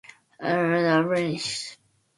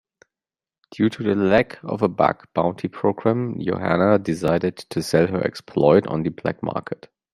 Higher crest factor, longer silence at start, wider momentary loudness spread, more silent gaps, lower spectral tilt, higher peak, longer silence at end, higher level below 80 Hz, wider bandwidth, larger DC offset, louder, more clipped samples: about the same, 18 dB vs 20 dB; second, 0.4 s vs 0.95 s; first, 12 LU vs 9 LU; neither; second, -5 dB/octave vs -7 dB/octave; second, -8 dBFS vs -2 dBFS; about the same, 0.45 s vs 0.4 s; second, -68 dBFS vs -54 dBFS; second, 11.5 kHz vs 13.5 kHz; neither; second, -24 LUFS vs -21 LUFS; neither